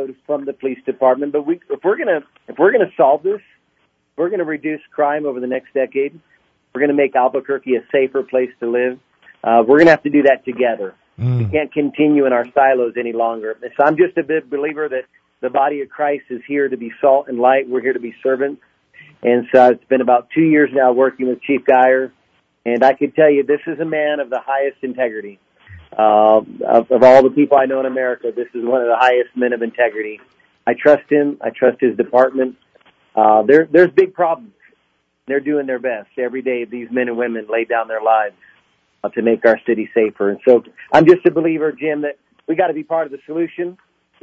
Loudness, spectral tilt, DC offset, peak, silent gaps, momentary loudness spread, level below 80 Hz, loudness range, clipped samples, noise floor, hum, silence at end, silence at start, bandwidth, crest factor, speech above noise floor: -16 LUFS; -8 dB/octave; under 0.1%; 0 dBFS; none; 12 LU; -60 dBFS; 6 LU; under 0.1%; -65 dBFS; none; 0.5 s; 0 s; 7.6 kHz; 16 dB; 50 dB